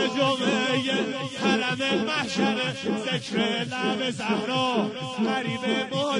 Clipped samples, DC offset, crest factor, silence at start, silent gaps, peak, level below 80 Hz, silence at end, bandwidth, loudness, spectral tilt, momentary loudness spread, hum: under 0.1%; under 0.1%; 16 dB; 0 s; none; -8 dBFS; -68 dBFS; 0 s; 11 kHz; -25 LUFS; -4.5 dB/octave; 4 LU; none